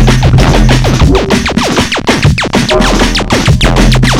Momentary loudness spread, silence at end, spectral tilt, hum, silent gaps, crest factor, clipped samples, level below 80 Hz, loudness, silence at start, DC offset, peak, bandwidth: 3 LU; 0 s; -5 dB/octave; none; none; 6 dB; 2%; -12 dBFS; -8 LUFS; 0 s; under 0.1%; 0 dBFS; 15 kHz